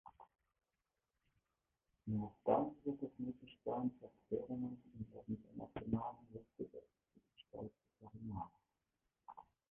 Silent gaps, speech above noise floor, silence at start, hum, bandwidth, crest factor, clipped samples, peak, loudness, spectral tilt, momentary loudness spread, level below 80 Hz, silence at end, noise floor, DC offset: none; over 46 dB; 0.05 s; none; 3.6 kHz; 26 dB; under 0.1%; -20 dBFS; -45 LUFS; -7.5 dB/octave; 21 LU; -70 dBFS; 0.3 s; under -90 dBFS; under 0.1%